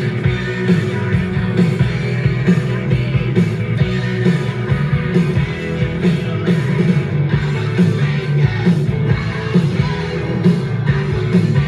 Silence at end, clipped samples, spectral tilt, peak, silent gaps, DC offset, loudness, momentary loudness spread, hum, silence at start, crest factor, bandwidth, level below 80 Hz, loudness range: 0 s; under 0.1%; -8 dB/octave; -2 dBFS; none; under 0.1%; -17 LUFS; 3 LU; none; 0 s; 14 dB; 10 kHz; -34 dBFS; 1 LU